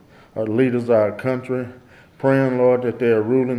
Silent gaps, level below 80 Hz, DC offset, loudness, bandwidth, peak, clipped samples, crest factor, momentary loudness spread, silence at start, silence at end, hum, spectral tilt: none; -62 dBFS; under 0.1%; -19 LUFS; 11.5 kHz; -4 dBFS; under 0.1%; 16 dB; 10 LU; 0.35 s; 0 s; none; -9 dB/octave